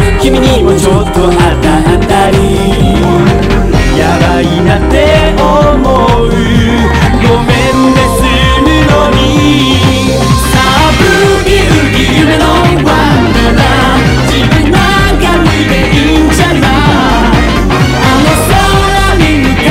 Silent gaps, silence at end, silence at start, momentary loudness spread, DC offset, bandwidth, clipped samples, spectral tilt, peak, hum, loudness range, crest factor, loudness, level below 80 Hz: none; 0 s; 0 s; 2 LU; under 0.1%; 16.5 kHz; 4%; -5.5 dB/octave; 0 dBFS; none; 1 LU; 6 dB; -7 LUFS; -14 dBFS